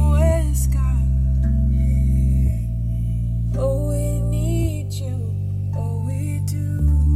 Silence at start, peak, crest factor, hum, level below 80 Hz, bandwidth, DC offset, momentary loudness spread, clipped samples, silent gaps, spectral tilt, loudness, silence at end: 0 s; -6 dBFS; 12 dB; none; -20 dBFS; 14 kHz; 0.1%; 6 LU; under 0.1%; none; -8 dB/octave; -21 LUFS; 0 s